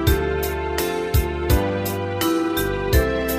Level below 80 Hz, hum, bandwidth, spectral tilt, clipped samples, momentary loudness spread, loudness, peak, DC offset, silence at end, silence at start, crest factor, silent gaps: -26 dBFS; none; 15.5 kHz; -5.5 dB/octave; under 0.1%; 4 LU; -22 LUFS; -4 dBFS; under 0.1%; 0 s; 0 s; 16 dB; none